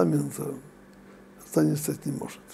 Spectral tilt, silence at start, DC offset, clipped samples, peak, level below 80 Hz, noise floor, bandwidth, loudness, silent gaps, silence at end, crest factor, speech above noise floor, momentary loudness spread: -6.5 dB/octave; 0 s; under 0.1%; under 0.1%; -8 dBFS; -64 dBFS; -50 dBFS; 16 kHz; -29 LUFS; none; 0 s; 22 dB; 23 dB; 14 LU